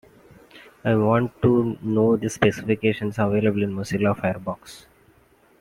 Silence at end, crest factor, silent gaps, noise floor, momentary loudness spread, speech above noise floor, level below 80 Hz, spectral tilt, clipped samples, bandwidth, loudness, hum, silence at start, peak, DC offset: 0.8 s; 20 dB; none; -57 dBFS; 9 LU; 36 dB; -54 dBFS; -7 dB/octave; under 0.1%; 15.5 kHz; -22 LUFS; none; 0.55 s; -4 dBFS; under 0.1%